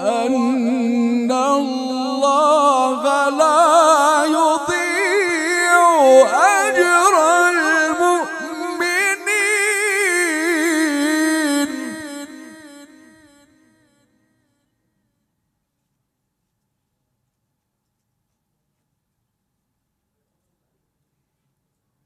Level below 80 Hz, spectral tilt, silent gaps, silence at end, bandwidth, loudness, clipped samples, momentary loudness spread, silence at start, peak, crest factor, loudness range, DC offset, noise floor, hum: -68 dBFS; -2 dB/octave; none; 9.2 s; 15.5 kHz; -15 LUFS; under 0.1%; 10 LU; 0 s; 0 dBFS; 18 dB; 8 LU; under 0.1%; -75 dBFS; none